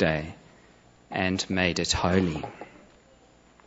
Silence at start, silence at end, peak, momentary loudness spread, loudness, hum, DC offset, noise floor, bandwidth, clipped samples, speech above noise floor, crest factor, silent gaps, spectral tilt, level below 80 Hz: 0 s; 1 s; -6 dBFS; 18 LU; -26 LUFS; 60 Hz at -60 dBFS; under 0.1%; -57 dBFS; 8.2 kHz; under 0.1%; 31 dB; 22 dB; none; -4.5 dB/octave; -48 dBFS